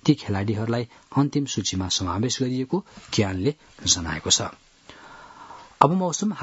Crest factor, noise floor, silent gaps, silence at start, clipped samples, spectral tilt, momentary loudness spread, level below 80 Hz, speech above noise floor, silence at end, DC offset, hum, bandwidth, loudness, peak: 24 dB; -47 dBFS; none; 0.05 s; under 0.1%; -4 dB/octave; 11 LU; -56 dBFS; 23 dB; 0 s; under 0.1%; none; 8.2 kHz; -24 LUFS; 0 dBFS